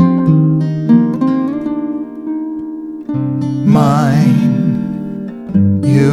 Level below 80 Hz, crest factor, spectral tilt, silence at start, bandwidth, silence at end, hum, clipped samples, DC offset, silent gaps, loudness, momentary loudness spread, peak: -48 dBFS; 12 dB; -9 dB/octave; 0 s; 12 kHz; 0 s; none; under 0.1%; under 0.1%; none; -14 LUFS; 12 LU; 0 dBFS